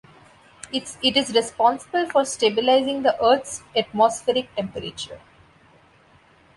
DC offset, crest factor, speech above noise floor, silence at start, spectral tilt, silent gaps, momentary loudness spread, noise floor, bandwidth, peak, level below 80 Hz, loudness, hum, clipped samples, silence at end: under 0.1%; 18 dB; 33 dB; 0.65 s; -3 dB/octave; none; 12 LU; -55 dBFS; 11.5 kHz; -4 dBFS; -58 dBFS; -21 LUFS; none; under 0.1%; 1.4 s